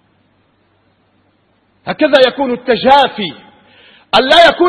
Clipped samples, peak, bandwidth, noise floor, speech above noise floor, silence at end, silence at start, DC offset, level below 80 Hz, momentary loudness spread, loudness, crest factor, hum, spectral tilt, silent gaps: 0.5%; 0 dBFS; 11 kHz; -56 dBFS; 46 dB; 0 s; 1.85 s; under 0.1%; -48 dBFS; 16 LU; -11 LUFS; 14 dB; none; -4 dB/octave; none